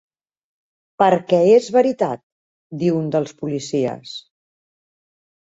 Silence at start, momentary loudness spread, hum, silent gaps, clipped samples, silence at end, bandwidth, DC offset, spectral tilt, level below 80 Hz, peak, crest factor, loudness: 1 s; 19 LU; none; 2.23-2.70 s; under 0.1%; 1.3 s; 8 kHz; under 0.1%; -6.5 dB/octave; -64 dBFS; -2 dBFS; 18 dB; -18 LUFS